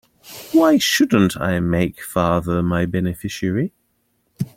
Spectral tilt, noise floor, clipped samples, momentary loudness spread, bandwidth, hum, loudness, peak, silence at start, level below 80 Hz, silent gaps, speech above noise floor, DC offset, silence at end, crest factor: -5.5 dB/octave; -66 dBFS; under 0.1%; 11 LU; 16.5 kHz; none; -19 LUFS; -2 dBFS; 0.25 s; -46 dBFS; none; 48 dB; under 0.1%; 0.1 s; 18 dB